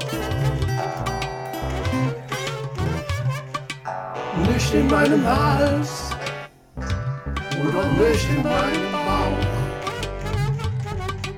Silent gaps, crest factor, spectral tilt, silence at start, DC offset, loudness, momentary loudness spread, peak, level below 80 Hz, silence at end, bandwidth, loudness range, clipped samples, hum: none; 18 dB; -6 dB/octave; 0 s; under 0.1%; -23 LUFS; 11 LU; -4 dBFS; -34 dBFS; 0 s; 16.5 kHz; 5 LU; under 0.1%; none